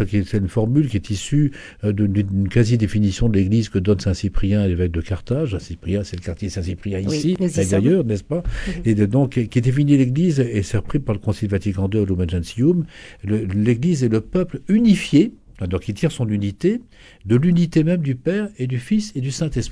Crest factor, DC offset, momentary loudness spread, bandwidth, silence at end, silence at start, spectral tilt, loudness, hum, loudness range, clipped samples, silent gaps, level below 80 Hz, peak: 16 dB; under 0.1%; 9 LU; 11 kHz; 0 s; 0 s; -7.5 dB/octave; -20 LUFS; none; 3 LU; under 0.1%; none; -36 dBFS; -2 dBFS